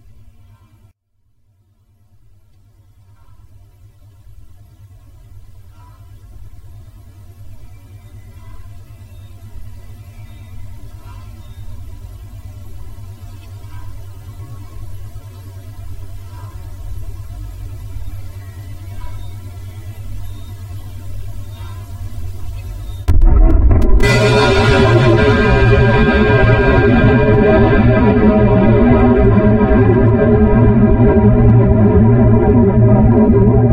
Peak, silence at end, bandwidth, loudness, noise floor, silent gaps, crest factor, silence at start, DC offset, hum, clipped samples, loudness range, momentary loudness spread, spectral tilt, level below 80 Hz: 0 dBFS; 0 s; 11 kHz; -11 LUFS; -60 dBFS; none; 14 dB; 4.45 s; under 0.1%; none; under 0.1%; 24 LU; 24 LU; -8 dB/octave; -20 dBFS